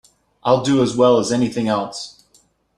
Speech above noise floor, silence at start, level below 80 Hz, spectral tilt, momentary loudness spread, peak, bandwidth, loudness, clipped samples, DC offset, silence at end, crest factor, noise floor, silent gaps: 41 dB; 0.45 s; -54 dBFS; -5.5 dB/octave; 14 LU; -2 dBFS; 11.5 kHz; -18 LUFS; under 0.1%; under 0.1%; 0.7 s; 18 dB; -58 dBFS; none